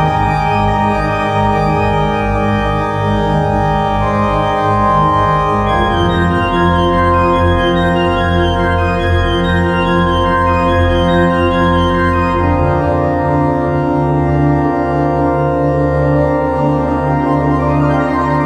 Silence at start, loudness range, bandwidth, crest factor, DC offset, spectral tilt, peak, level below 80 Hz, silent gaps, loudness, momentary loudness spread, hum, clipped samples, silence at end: 0 s; 2 LU; 10.5 kHz; 12 dB; under 0.1%; -7.5 dB/octave; 0 dBFS; -26 dBFS; none; -13 LUFS; 3 LU; none; under 0.1%; 0 s